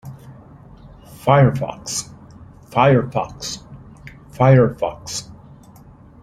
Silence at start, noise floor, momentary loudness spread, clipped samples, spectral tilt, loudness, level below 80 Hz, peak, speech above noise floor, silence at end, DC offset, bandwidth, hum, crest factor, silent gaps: 0.05 s; -44 dBFS; 21 LU; under 0.1%; -6 dB/octave; -18 LUFS; -46 dBFS; -2 dBFS; 28 dB; 0.9 s; under 0.1%; 13.5 kHz; none; 18 dB; none